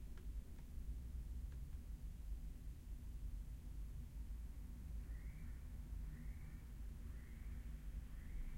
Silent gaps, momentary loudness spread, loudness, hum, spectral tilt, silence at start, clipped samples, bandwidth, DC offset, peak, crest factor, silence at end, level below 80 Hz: none; 3 LU; -54 LUFS; none; -6.5 dB/octave; 0 s; under 0.1%; 16.5 kHz; under 0.1%; -38 dBFS; 12 dB; 0 s; -50 dBFS